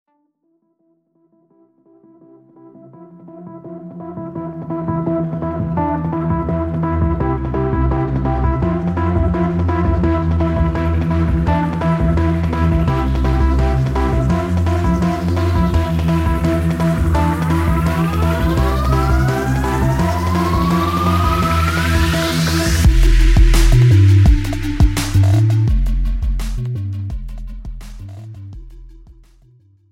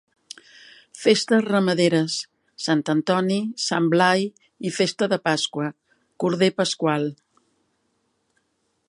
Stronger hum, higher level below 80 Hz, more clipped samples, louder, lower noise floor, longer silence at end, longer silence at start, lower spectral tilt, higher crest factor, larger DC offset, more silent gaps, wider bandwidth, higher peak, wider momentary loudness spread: neither; first, -20 dBFS vs -72 dBFS; neither; first, -16 LUFS vs -22 LUFS; second, -64 dBFS vs -71 dBFS; second, 0.8 s vs 1.75 s; first, 2.65 s vs 0.95 s; first, -7 dB/octave vs -4.5 dB/octave; second, 14 dB vs 20 dB; neither; neither; first, 16.5 kHz vs 11.5 kHz; about the same, -2 dBFS vs -4 dBFS; about the same, 14 LU vs 13 LU